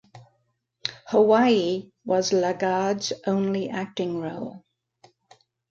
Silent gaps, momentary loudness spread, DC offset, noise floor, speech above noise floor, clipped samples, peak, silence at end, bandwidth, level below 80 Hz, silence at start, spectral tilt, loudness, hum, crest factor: none; 15 LU; under 0.1%; -72 dBFS; 49 dB; under 0.1%; -6 dBFS; 1.15 s; 7.6 kHz; -68 dBFS; 0.15 s; -5 dB/octave; -24 LUFS; none; 18 dB